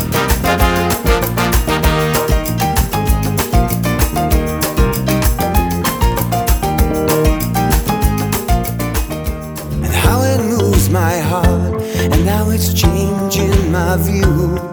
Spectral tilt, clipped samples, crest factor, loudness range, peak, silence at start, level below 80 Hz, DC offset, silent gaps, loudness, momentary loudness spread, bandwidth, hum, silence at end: -5.5 dB/octave; under 0.1%; 14 dB; 2 LU; 0 dBFS; 0 s; -20 dBFS; under 0.1%; none; -15 LUFS; 4 LU; over 20 kHz; none; 0 s